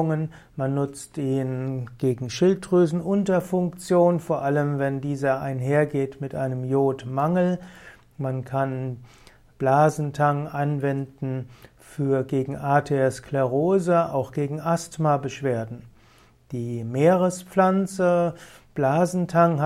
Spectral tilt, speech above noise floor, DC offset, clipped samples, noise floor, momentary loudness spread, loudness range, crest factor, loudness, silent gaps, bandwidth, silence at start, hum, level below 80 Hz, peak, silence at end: -7.5 dB/octave; 32 dB; under 0.1%; under 0.1%; -55 dBFS; 11 LU; 3 LU; 18 dB; -24 LUFS; none; 14.5 kHz; 0 s; none; -58 dBFS; -6 dBFS; 0 s